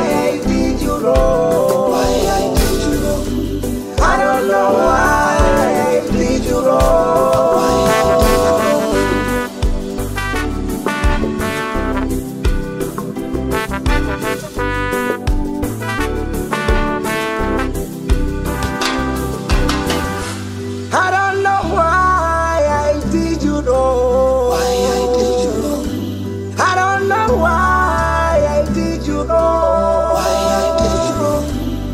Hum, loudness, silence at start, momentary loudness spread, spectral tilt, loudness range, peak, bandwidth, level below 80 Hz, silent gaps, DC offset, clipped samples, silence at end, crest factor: none; -16 LUFS; 0 s; 8 LU; -5 dB/octave; 6 LU; -2 dBFS; 16 kHz; -24 dBFS; none; under 0.1%; under 0.1%; 0 s; 14 dB